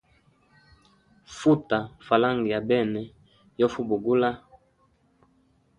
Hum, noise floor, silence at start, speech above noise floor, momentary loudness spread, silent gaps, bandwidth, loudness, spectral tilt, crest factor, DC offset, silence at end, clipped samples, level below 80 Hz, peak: none; -65 dBFS; 1.3 s; 41 dB; 12 LU; none; 10.5 kHz; -25 LUFS; -6.5 dB/octave; 22 dB; under 0.1%; 1.4 s; under 0.1%; -62 dBFS; -6 dBFS